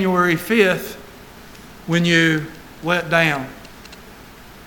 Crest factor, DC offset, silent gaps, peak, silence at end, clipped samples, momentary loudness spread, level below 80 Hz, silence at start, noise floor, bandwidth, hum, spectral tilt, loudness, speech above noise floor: 20 dB; under 0.1%; none; 0 dBFS; 0.05 s; under 0.1%; 24 LU; -50 dBFS; 0 s; -41 dBFS; 19 kHz; none; -5 dB/octave; -18 LUFS; 23 dB